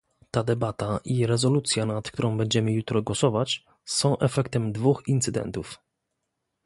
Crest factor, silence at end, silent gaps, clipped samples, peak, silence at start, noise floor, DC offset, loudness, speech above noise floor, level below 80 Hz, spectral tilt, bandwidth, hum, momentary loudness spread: 18 dB; 0.9 s; none; under 0.1%; -8 dBFS; 0.35 s; -80 dBFS; under 0.1%; -25 LUFS; 55 dB; -54 dBFS; -5 dB/octave; 11.5 kHz; none; 8 LU